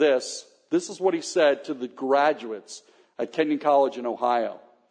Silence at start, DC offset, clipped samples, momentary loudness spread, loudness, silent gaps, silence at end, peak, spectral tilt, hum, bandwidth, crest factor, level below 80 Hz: 0 s; under 0.1%; under 0.1%; 14 LU; -25 LUFS; none; 0.3 s; -8 dBFS; -3.5 dB/octave; none; 10 kHz; 16 dB; -84 dBFS